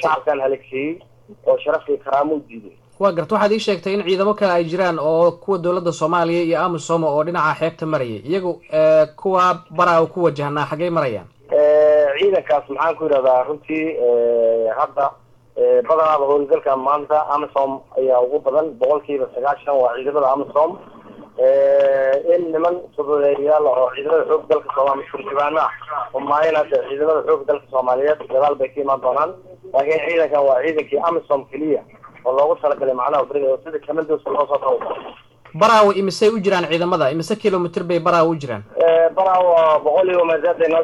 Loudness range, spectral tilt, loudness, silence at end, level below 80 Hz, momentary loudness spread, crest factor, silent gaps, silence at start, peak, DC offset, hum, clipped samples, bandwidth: 3 LU; -6 dB/octave; -18 LUFS; 0 s; -64 dBFS; 8 LU; 16 dB; none; 0 s; -2 dBFS; under 0.1%; none; under 0.1%; 11.5 kHz